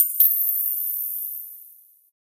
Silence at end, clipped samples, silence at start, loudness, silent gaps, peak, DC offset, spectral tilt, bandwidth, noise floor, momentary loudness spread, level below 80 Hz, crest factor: 0.65 s; under 0.1%; 0 s; -20 LUFS; none; -4 dBFS; under 0.1%; 3.5 dB/octave; 16 kHz; -50 dBFS; 20 LU; -90 dBFS; 20 dB